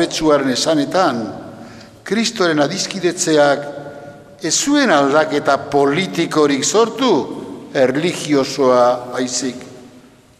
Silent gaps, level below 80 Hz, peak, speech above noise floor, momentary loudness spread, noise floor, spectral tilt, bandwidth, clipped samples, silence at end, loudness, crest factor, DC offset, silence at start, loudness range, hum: none; -54 dBFS; 0 dBFS; 29 dB; 16 LU; -45 dBFS; -3.5 dB/octave; 14.5 kHz; under 0.1%; 0.5 s; -16 LUFS; 16 dB; under 0.1%; 0 s; 3 LU; none